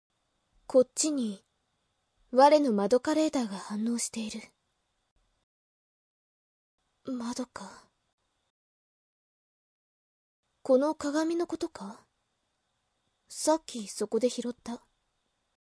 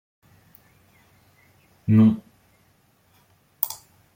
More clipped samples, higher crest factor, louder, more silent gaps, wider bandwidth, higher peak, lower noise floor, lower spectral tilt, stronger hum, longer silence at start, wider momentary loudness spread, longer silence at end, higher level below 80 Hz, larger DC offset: neither; about the same, 24 dB vs 24 dB; second, -29 LUFS vs -22 LUFS; first, 5.11-5.16 s, 5.43-6.78 s, 8.13-8.18 s, 8.50-10.43 s vs none; second, 11 kHz vs 17 kHz; second, -8 dBFS vs -4 dBFS; first, -79 dBFS vs -62 dBFS; second, -4 dB/octave vs -7.5 dB/octave; neither; second, 0.7 s vs 1.9 s; about the same, 19 LU vs 17 LU; first, 0.85 s vs 0.4 s; second, -72 dBFS vs -64 dBFS; neither